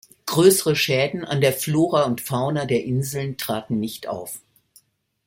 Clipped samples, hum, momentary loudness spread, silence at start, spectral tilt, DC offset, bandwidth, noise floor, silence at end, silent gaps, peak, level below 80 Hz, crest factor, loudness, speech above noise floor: under 0.1%; none; 14 LU; 0.25 s; -4.5 dB/octave; under 0.1%; 16.5 kHz; -58 dBFS; 0.9 s; none; -4 dBFS; -60 dBFS; 18 dB; -21 LUFS; 37 dB